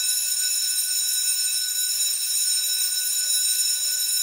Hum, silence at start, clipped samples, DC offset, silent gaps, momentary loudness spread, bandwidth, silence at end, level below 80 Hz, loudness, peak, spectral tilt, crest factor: none; 0 s; under 0.1%; under 0.1%; none; 2 LU; 16 kHz; 0 s; -74 dBFS; -20 LUFS; -10 dBFS; 6 dB/octave; 14 dB